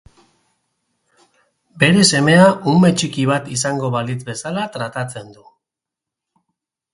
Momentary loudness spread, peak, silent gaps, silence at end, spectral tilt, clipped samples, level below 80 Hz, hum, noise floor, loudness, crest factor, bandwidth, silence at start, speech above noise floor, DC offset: 14 LU; 0 dBFS; none; 1.6 s; -4.5 dB/octave; under 0.1%; -56 dBFS; none; -85 dBFS; -16 LUFS; 18 dB; 11.5 kHz; 1.75 s; 69 dB; under 0.1%